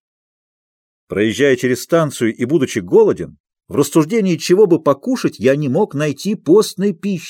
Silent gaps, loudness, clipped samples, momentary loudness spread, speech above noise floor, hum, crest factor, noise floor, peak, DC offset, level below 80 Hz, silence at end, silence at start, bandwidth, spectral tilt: 3.40-3.44 s; -16 LUFS; under 0.1%; 7 LU; over 75 dB; none; 14 dB; under -90 dBFS; -2 dBFS; under 0.1%; -58 dBFS; 0 s; 1.1 s; 16.5 kHz; -6 dB/octave